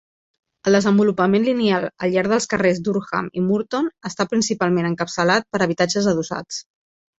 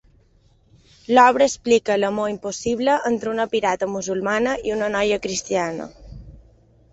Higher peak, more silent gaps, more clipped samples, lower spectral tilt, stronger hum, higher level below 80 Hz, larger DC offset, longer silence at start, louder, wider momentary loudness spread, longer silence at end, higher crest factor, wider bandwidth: about the same, -2 dBFS vs -2 dBFS; neither; neither; first, -5 dB/octave vs -3.5 dB/octave; neither; second, -58 dBFS vs -50 dBFS; neither; second, 0.65 s vs 1.1 s; about the same, -20 LUFS vs -20 LUFS; about the same, 8 LU vs 10 LU; about the same, 0.55 s vs 0.6 s; about the same, 18 dB vs 20 dB; about the same, 8 kHz vs 8.2 kHz